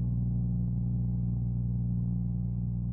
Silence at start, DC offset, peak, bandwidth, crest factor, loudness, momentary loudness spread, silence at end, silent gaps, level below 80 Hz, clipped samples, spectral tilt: 0 s; under 0.1%; -22 dBFS; 1.1 kHz; 8 dB; -31 LUFS; 2 LU; 0 s; none; -38 dBFS; under 0.1%; -17.5 dB/octave